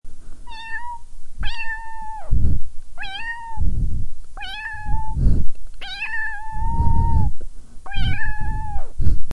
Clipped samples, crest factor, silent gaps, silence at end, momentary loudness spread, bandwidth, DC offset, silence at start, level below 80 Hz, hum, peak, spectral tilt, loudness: under 0.1%; 14 dB; none; 0 s; 15 LU; 5.2 kHz; under 0.1%; 0.05 s; -24 dBFS; none; 0 dBFS; -6 dB/octave; -27 LUFS